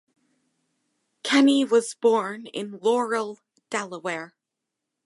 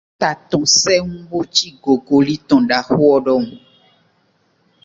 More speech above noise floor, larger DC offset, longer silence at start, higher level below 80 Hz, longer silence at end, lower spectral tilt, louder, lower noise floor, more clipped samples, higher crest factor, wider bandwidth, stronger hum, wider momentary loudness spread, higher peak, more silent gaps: first, 61 dB vs 45 dB; neither; first, 1.25 s vs 0.2 s; second, -82 dBFS vs -52 dBFS; second, 0.8 s vs 1.3 s; about the same, -3.5 dB/octave vs -3.5 dB/octave; second, -24 LUFS vs -15 LUFS; first, -84 dBFS vs -60 dBFS; neither; about the same, 18 dB vs 16 dB; first, 11.5 kHz vs 7.8 kHz; neither; first, 16 LU vs 8 LU; second, -8 dBFS vs 0 dBFS; neither